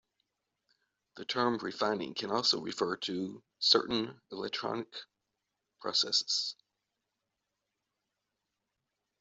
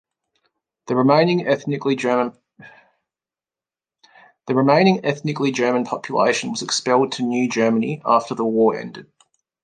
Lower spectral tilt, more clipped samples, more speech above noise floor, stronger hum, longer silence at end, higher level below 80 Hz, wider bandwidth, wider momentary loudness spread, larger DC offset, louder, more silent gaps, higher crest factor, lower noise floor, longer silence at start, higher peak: second, -2.5 dB/octave vs -5 dB/octave; neither; second, 53 dB vs over 71 dB; neither; first, 2.7 s vs 0.6 s; second, -78 dBFS vs -68 dBFS; second, 8.2 kHz vs 10 kHz; first, 15 LU vs 8 LU; neither; second, -32 LUFS vs -19 LUFS; neither; first, 26 dB vs 20 dB; second, -86 dBFS vs under -90 dBFS; first, 1.15 s vs 0.85 s; second, -10 dBFS vs 0 dBFS